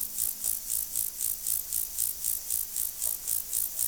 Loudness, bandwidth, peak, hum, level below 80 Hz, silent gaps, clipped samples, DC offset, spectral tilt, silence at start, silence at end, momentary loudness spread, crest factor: -28 LUFS; over 20 kHz; -12 dBFS; none; -58 dBFS; none; under 0.1%; 0.1%; 1 dB/octave; 0 s; 0 s; 2 LU; 20 dB